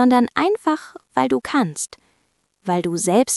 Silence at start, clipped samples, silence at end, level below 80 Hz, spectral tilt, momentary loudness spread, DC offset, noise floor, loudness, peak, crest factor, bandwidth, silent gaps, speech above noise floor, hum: 0 s; under 0.1%; 0 s; -62 dBFS; -4.5 dB/octave; 10 LU; under 0.1%; -67 dBFS; -20 LUFS; -2 dBFS; 18 dB; 12 kHz; none; 48 dB; none